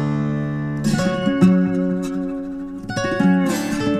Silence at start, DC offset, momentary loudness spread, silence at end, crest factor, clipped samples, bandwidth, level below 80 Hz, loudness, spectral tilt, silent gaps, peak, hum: 0 s; under 0.1%; 11 LU; 0 s; 16 dB; under 0.1%; 13.5 kHz; -44 dBFS; -20 LUFS; -6.5 dB/octave; none; -2 dBFS; none